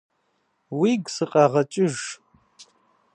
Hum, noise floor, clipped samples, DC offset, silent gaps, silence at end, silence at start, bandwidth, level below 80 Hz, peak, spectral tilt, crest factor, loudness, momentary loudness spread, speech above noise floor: none; -70 dBFS; under 0.1%; under 0.1%; none; 0.5 s; 0.7 s; 11 kHz; -72 dBFS; -4 dBFS; -5.5 dB/octave; 20 dB; -22 LUFS; 15 LU; 49 dB